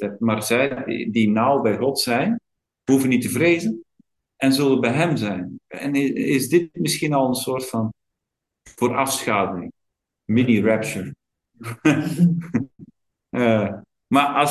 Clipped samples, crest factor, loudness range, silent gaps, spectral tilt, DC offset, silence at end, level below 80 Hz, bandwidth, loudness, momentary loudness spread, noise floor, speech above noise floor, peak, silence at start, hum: under 0.1%; 18 dB; 3 LU; none; -5.5 dB/octave; under 0.1%; 0 s; -58 dBFS; 12.5 kHz; -21 LUFS; 12 LU; -83 dBFS; 63 dB; -2 dBFS; 0 s; none